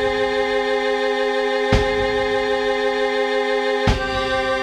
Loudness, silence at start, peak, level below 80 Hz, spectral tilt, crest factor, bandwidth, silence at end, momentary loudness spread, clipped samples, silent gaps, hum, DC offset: -19 LUFS; 0 s; -2 dBFS; -32 dBFS; -5 dB/octave; 18 dB; 11 kHz; 0 s; 2 LU; under 0.1%; none; none; under 0.1%